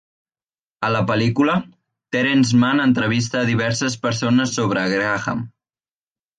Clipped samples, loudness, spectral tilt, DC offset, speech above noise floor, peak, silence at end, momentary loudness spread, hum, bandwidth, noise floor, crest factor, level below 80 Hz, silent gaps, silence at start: under 0.1%; -19 LUFS; -5 dB/octave; under 0.1%; over 72 dB; -6 dBFS; 0.9 s; 9 LU; none; 9.4 kHz; under -90 dBFS; 14 dB; -54 dBFS; none; 0.8 s